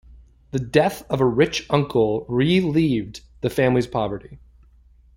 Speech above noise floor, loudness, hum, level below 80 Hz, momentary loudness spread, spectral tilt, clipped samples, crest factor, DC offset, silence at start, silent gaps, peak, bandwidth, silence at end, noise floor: 32 dB; -21 LUFS; none; -48 dBFS; 10 LU; -6.5 dB/octave; under 0.1%; 20 dB; under 0.1%; 0.55 s; none; -2 dBFS; 16.5 kHz; 0.8 s; -52 dBFS